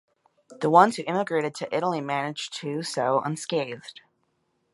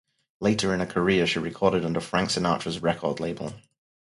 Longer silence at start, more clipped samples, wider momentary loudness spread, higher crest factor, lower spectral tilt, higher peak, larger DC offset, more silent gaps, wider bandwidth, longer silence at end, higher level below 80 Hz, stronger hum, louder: about the same, 0.5 s vs 0.4 s; neither; first, 13 LU vs 7 LU; about the same, 24 dB vs 20 dB; about the same, -5 dB/octave vs -5 dB/octave; first, -2 dBFS vs -6 dBFS; neither; neither; about the same, 11.5 kHz vs 11.5 kHz; first, 0.8 s vs 0.5 s; second, -78 dBFS vs -52 dBFS; neither; about the same, -25 LUFS vs -25 LUFS